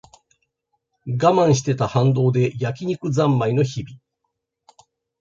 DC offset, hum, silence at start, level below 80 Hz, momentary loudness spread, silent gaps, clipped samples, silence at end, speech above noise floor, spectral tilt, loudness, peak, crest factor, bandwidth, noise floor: under 0.1%; none; 1.05 s; -56 dBFS; 12 LU; none; under 0.1%; 1.25 s; 58 dB; -7 dB/octave; -20 LUFS; -2 dBFS; 18 dB; 7.6 kHz; -77 dBFS